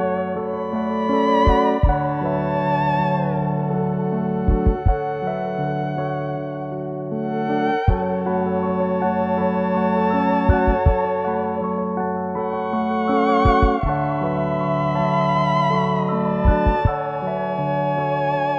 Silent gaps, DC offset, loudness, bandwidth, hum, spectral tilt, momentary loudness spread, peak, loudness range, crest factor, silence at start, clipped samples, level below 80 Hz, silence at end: none; under 0.1%; -21 LUFS; 6.8 kHz; none; -9 dB/octave; 7 LU; -4 dBFS; 4 LU; 16 dB; 0 s; under 0.1%; -28 dBFS; 0 s